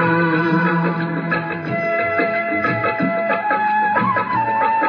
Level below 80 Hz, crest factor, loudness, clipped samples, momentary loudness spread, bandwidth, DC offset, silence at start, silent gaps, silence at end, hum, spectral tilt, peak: -60 dBFS; 14 dB; -18 LUFS; under 0.1%; 4 LU; 5.4 kHz; under 0.1%; 0 s; none; 0 s; none; -9 dB/octave; -4 dBFS